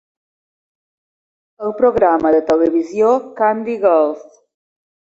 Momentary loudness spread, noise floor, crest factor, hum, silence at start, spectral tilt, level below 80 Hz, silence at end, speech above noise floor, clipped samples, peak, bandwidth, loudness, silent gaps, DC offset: 8 LU; under -90 dBFS; 16 dB; none; 1.6 s; -7 dB/octave; -54 dBFS; 0.9 s; over 75 dB; under 0.1%; -2 dBFS; 7.8 kHz; -15 LUFS; none; under 0.1%